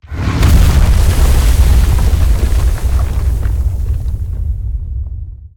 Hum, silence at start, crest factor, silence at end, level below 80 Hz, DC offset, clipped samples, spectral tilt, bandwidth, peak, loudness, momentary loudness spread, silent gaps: none; 0.1 s; 10 dB; 0.1 s; -12 dBFS; under 0.1%; under 0.1%; -6 dB/octave; 18 kHz; 0 dBFS; -14 LUFS; 11 LU; none